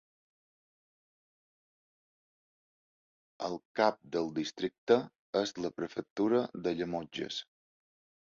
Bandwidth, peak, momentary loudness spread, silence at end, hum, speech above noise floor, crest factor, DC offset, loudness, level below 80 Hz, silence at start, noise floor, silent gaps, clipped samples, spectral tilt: 7.6 kHz; -12 dBFS; 10 LU; 0.85 s; none; over 57 dB; 24 dB; under 0.1%; -34 LUFS; -74 dBFS; 3.4 s; under -90 dBFS; 3.65-3.75 s, 4.78-4.87 s, 5.19-5.33 s, 6.10-6.16 s; under 0.1%; -5 dB/octave